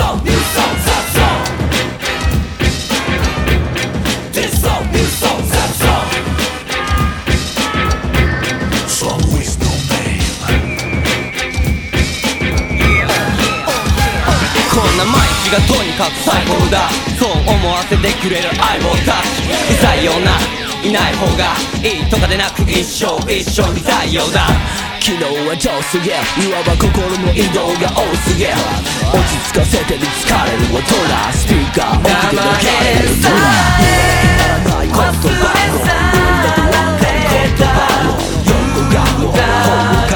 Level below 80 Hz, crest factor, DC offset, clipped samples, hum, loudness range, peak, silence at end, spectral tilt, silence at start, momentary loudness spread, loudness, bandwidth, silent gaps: -20 dBFS; 12 dB; under 0.1%; under 0.1%; none; 4 LU; 0 dBFS; 0 s; -4 dB/octave; 0 s; 5 LU; -13 LUFS; over 20 kHz; none